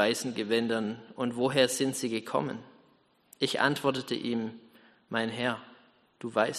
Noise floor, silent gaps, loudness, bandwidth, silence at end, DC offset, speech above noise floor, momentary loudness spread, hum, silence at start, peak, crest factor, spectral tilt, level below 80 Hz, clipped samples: -66 dBFS; none; -30 LUFS; 13.5 kHz; 0 s; under 0.1%; 36 dB; 11 LU; none; 0 s; -8 dBFS; 22 dB; -4 dB/octave; -74 dBFS; under 0.1%